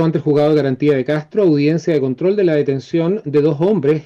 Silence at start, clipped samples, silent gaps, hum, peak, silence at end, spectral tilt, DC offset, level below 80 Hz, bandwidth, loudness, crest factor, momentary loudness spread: 0 s; under 0.1%; none; none; -6 dBFS; 0.05 s; -8.5 dB/octave; under 0.1%; -58 dBFS; 7.2 kHz; -16 LUFS; 10 dB; 4 LU